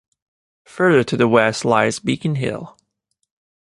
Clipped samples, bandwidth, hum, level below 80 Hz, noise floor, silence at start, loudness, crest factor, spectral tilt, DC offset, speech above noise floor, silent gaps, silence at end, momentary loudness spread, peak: under 0.1%; 11.5 kHz; none; -56 dBFS; -73 dBFS; 0.75 s; -17 LUFS; 18 dB; -5.5 dB/octave; under 0.1%; 56 dB; none; 1 s; 9 LU; -2 dBFS